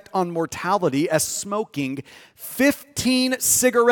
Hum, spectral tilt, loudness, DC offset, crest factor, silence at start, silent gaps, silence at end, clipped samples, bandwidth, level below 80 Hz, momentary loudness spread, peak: none; -3 dB/octave; -21 LUFS; under 0.1%; 18 dB; 0.15 s; none; 0 s; under 0.1%; 18 kHz; -58 dBFS; 12 LU; -4 dBFS